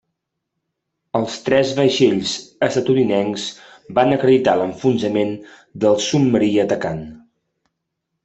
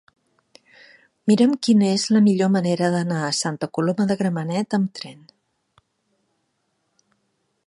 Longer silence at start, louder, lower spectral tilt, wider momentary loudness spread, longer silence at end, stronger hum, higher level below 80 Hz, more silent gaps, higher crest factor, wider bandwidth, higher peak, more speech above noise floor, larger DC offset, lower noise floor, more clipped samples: about the same, 1.15 s vs 1.25 s; about the same, -18 LUFS vs -20 LUFS; about the same, -5.5 dB/octave vs -5.5 dB/octave; about the same, 10 LU vs 8 LU; second, 1.1 s vs 2.55 s; neither; first, -56 dBFS vs -70 dBFS; neither; about the same, 16 dB vs 18 dB; second, 8.2 kHz vs 11.5 kHz; about the same, -2 dBFS vs -4 dBFS; first, 60 dB vs 52 dB; neither; first, -78 dBFS vs -72 dBFS; neither